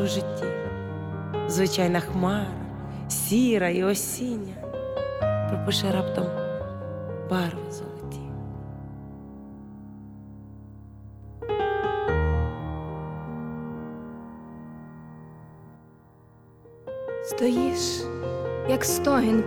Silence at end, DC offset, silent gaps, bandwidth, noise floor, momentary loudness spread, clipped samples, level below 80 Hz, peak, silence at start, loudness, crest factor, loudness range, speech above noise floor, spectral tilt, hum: 0 s; under 0.1%; none; over 20 kHz; -53 dBFS; 21 LU; under 0.1%; -46 dBFS; -10 dBFS; 0 s; -27 LUFS; 18 dB; 15 LU; 29 dB; -5 dB/octave; none